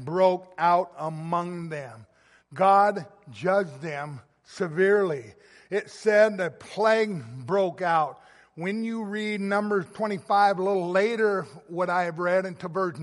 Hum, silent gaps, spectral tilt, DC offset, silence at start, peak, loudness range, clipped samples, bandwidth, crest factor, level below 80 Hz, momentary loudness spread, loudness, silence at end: none; none; -6 dB/octave; under 0.1%; 0 s; -8 dBFS; 2 LU; under 0.1%; 11.5 kHz; 18 dB; -74 dBFS; 14 LU; -25 LUFS; 0 s